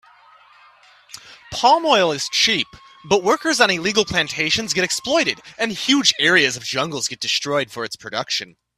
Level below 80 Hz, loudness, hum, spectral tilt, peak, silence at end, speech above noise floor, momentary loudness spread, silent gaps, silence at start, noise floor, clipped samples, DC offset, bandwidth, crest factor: -56 dBFS; -18 LUFS; none; -2 dB/octave; 0 dBFS; 0.3 s; 31 dB; 12 LU; none; 1.15 s; -50 dBFS; under 0.1%; under 0.1%; 15.5 kHz; 20 dB